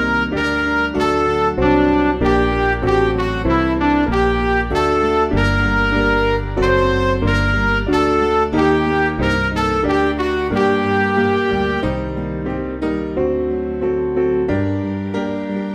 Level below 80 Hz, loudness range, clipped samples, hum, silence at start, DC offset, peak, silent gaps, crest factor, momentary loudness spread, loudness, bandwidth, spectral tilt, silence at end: -28 dBFS; 4 LU; under 0.1%; none; 0 s; under 0.1%; -2 dBFS; none; 14 dB; 6 LU; -17 LUFS; 11.5 kHz; -7 dB/octave; 0 s